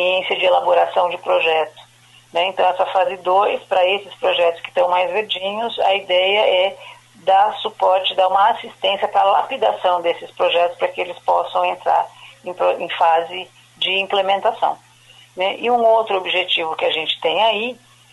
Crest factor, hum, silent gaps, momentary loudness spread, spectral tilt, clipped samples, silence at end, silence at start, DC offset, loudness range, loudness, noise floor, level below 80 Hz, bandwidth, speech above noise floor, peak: 14 dB; none; none; 7 LU; -3 dB/octave; under 0.1%; 0.4 s; 0 s; under 0.1%; 3 LU; -18 LUFS; -48 dBFS; -68 dBFS; 12 kHz; 30 dB; -4 dBFS